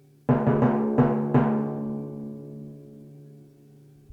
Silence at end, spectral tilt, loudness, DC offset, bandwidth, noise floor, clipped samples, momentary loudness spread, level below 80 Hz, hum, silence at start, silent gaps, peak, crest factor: 0.7 s; -11 dB/octave; -24 LUFS; under 0.1%; 3.9 kHz; -52 dBFS; under 0.1%; 20 LU; -54 dBFS; none; 0.3 s; none; -8 dBFS; 20 dB